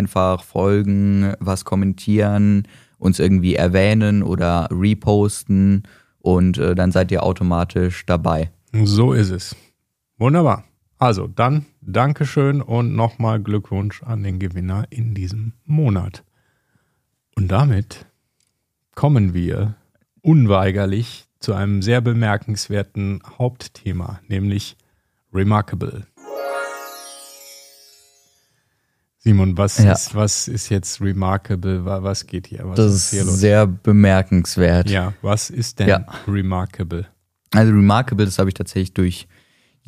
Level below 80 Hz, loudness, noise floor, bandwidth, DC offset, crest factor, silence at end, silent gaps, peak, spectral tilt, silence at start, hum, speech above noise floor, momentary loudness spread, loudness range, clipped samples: -42 dBFS; -18 LUFS; -71 dBFS; 14.5 kHz; under 0.1%; 18 dB; 0.65 s; none; 0 dBFS; -6.5 dB/octave; 0 s; none; 54 dB; 12 LU; 7 LU; under 0.1%